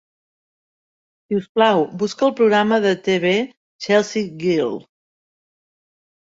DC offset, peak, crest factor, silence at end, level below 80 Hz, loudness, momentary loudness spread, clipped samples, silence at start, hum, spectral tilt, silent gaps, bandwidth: under 0.1%; -2 dBFS; 20 dB; 1.6 s; -66 dBFS; -18 LUFS; 9 LU; under 0.1%; 1.3 s; none; -5 dB/octave; 1.49-1.55 s, 3.57-3.79 s; 7.8 kHz